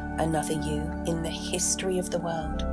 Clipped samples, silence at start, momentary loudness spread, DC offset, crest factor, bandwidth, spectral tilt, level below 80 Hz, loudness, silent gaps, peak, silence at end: under 0.1%; 0 s; 5 LU; under 0.1%; 16 dB; 11 kHz; -4 dB/octave; -38 dBFS; -28 LUFS; none; -14 dBFS; 0 s